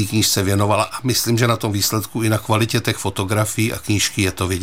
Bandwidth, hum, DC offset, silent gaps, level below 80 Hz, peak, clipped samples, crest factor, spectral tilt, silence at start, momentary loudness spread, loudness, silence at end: 16.5 kHz; none; 0.8%; none; -48 dBFS; -2 dBFS; under 0.1%; 18 dB; -4 dB/octave; 0 s; 4 LU; -18 LUFS; 0 s